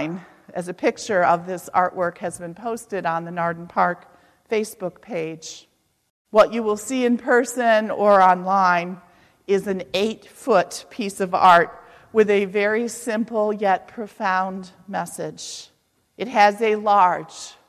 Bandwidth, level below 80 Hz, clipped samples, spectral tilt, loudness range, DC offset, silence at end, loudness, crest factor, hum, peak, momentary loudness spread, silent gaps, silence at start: 14 kHz; -64 dBFS; under 0.1%; -4.5 dB/octave; 7 LU; under 0.1%; 0.2 s; -21 LUFS; 18 dB; none; -2 dBFS; 15 LU; 6.10-6.25 s; 0 s